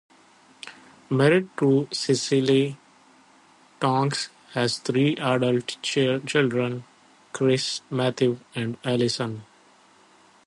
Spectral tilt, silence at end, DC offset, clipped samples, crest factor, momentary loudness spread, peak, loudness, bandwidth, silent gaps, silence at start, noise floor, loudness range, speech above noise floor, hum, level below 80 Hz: -5 dB/octave; 1.05 s; under 0.1%; under 0.1%; 18 dB; 11 LU; -6 dBFS; -24 LUFS; 11.5 kHz; none; 0.65 s; -56 dBFS; 3 LU; 33 dB; none; -68 dBFS